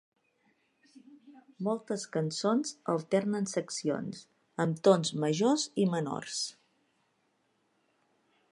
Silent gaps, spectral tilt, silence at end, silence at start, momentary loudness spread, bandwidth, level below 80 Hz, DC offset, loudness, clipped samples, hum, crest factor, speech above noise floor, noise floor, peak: none; -5 dB/octave; 2 s; 0.95 s; 10 LU; 11.5 kHz; -80 dBFS; under 0.1%; -31 LUFS; under 0.1%; none; 24 dB; 44 dB; -75 dBFS; -10 dBFS